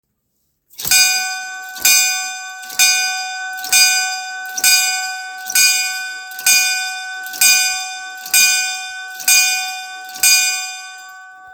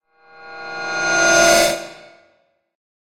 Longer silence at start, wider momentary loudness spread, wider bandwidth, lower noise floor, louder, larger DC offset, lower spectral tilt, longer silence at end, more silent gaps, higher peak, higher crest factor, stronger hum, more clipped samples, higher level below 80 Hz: first, 0.8 s vs 0.4 s; second, 16 LU vs 23 LU; first, over 20 kHz vs 16.5 kHz; first, -68 dBFS vs -62 dBFS; about the same, -13 LUFS vs -15 LUFS; neither; second, 4 dB/octave vs -1 dB/octave; second, 0 s vs 1.1 s; neither; about the same, 0 dBFS vs 0 dBFS; about the same, 18 dB vs 20 dB; neither; neither; second, -60 dBFS vs -48 dBFS